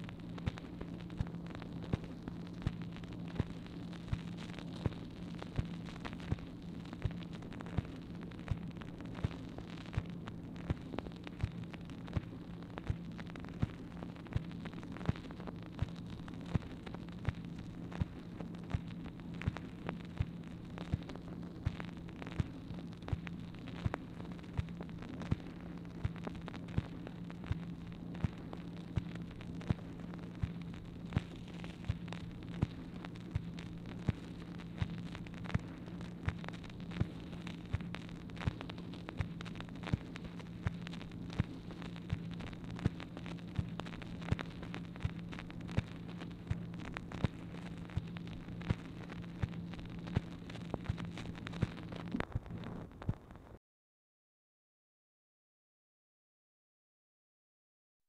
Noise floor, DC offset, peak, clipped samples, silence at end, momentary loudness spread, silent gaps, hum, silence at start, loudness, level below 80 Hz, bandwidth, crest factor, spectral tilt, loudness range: under -90 dBFS; under 0.1%; -18 dBFS; under 0.1%; 4.5 s; 7 LU; none; none; 0 s; -44 LUFS; -52 dBFS; 10.5 kHz; 24 dB; -7.5 dB/octave; 1 LU